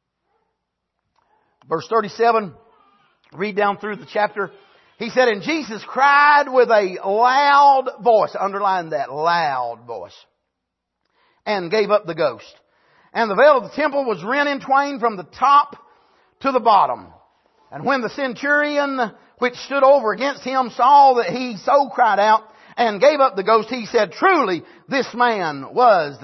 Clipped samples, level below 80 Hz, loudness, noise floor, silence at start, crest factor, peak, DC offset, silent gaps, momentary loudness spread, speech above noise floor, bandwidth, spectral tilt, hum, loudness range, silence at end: under 0.1%; -68 dBFS; -18 LUFS; -79 dBFS; 1.7 s; 16 dB; -2 dBFS; under 0.1%; none; 13 LU; 61 dB; 6.2 kHz; -4.5 dB/octave; none; 8 LU; 0.05 s